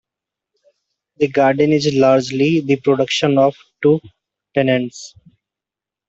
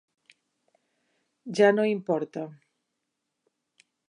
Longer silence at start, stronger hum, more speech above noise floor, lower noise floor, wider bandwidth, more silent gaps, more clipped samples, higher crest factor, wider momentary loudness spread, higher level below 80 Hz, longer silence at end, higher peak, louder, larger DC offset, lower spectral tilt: second, 1.2 s vs 1.45 s; neither; first, 72 dB vs 57 dB; first, -87 dBFS vs -82 dBFS; second, 8 kHz vs 10.5 kHz; neither; neither; second, 16 dB vs 22 dB; second, 8 LU vs 19 LU; first, -60 dBFS vs -86 dBFS; second, 1 s vs 1.55 s; first, -2 dBFS vs -8 dBFS; first, -16 LUFS vs -25 LUFS; neither; about the same, -6 dB/octave vs -6 dB/octave